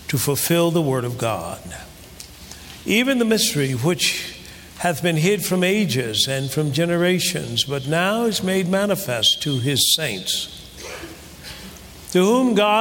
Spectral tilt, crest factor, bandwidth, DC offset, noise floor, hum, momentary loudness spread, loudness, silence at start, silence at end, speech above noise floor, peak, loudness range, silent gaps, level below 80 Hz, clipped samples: -4 dB/octave; 16 dB; 17 kHz; under 0.1%; -40 dBFS; none; 20 LU; -19 LUFS; 0 s; 0 s; 21 dB; -4 dBFS; 2 LU; none; -50 dBFS; under 0.1%